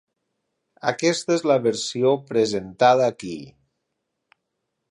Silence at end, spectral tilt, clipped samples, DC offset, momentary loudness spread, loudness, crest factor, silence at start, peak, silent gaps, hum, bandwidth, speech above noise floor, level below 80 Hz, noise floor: 1.45 s; -4.5 dB/octave; under 0.1%; under 0.1%; 12 LU; -21 LUFS; 20 dB; 0.85 s; -4 dBFS; none; none; 11 kHz; 58 dB; -66 dBFS; -78 dBFS